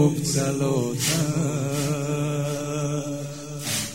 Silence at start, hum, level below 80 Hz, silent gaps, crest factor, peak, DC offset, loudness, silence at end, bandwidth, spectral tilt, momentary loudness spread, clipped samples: 0 s; none; -56 dBFS; none; 18 dB; -8 dBFS; 0.3%; -25 LUFS; 0 s; 16.5 kHz; -5 dB/octave; 8 LU; under 0.1%